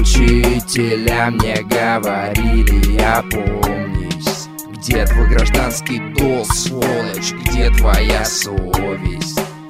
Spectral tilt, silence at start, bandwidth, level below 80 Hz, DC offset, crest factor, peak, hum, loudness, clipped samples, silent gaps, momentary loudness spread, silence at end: -4.5 dB/octave; 0 s; 16 kHz; -18 dBFS; under 0.1%; 14 dB; 0 dBFS; none; -16 LUFS; under 0.1%; none; 7 LU; 0 s